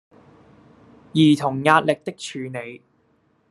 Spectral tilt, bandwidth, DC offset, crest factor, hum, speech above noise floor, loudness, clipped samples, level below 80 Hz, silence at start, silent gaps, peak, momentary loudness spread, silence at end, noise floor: -6 dB/octave; 12 kHz; under 0.1%; 22 dB; none; 43 dB; -20 LUFS; under 0.1%; -64 dBFS; 1.15 s; none; 0 dBFS; 15 LU; 0.75 s; -63 dBFS